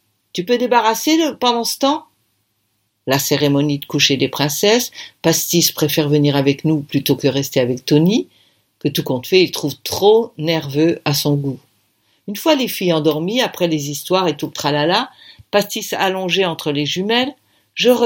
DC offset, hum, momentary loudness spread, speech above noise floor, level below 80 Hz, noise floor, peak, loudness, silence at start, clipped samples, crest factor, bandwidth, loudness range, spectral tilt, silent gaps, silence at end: under 0.1%; none; 7 LU; 51 dB; -60 dBFS; -67 dBFS; 0 dBFS; -17 LUFS; 0.35 s; under 0.1%; 18 dB; 17 kHz; 3 LU; -4.5 dB/octave; none; 0 s